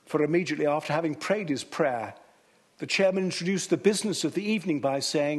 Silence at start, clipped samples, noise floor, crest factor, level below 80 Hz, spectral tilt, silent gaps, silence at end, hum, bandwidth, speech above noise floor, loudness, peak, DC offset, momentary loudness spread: 0.1 s; under 0.1%; -62 dBFS; 18 dB; -74 dBFS; -4.5 dB/octave; none; 0 s; none; 12.5 kHz; 36 dB; -27 LUFS; -10 dBFS; under 0.1%; 5 LU